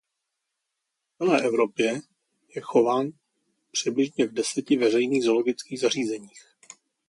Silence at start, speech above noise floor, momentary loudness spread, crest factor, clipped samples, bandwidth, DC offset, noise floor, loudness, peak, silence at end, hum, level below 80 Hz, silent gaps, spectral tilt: 1.2 s; 58 dB; 10 LU; 20 dB; under 0.1%; 11.5 kHz; under 0.1%; -82 dBFS; -25 LUFS; -8 dBFS; 0.7 s; none; -74 dBFS; none; -4 dB/octave